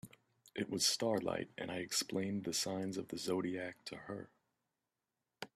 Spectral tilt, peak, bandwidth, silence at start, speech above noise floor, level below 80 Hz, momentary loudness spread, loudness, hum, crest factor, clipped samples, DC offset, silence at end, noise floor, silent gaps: -3 dB/octave; -20 dBFS; 15 kHz; 0.05 s; 51 dB; -78 dBFS; 16 LU; -38 LUFS; none; 22 dB; under 0.1%; under 0.1%; 0.1 s; -90 dBFS; none